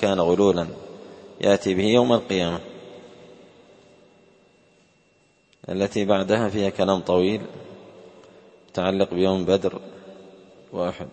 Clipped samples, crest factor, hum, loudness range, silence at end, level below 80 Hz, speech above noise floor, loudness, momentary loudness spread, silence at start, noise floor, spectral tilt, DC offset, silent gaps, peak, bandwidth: under 0.1%; 22 dB; none; 7 LU; 0.05 s; -58 dBFS; 40 dB; -22 LUFS; 24 LU; 0 s; -61 dBFS; -6 dB/octave; under 0.1%; none; -2 dBFS; 8.8 kHz